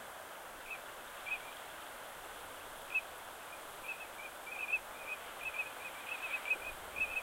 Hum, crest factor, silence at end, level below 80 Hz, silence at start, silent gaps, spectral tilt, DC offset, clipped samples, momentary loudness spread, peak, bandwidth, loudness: none; 20 dB; 0 s; -68 dBFS; 0 s; none; -1 dB/octave; under 0.1%; under 0.1%; 11 LU; -24 dBFS; 16 kHz; -42 LUFS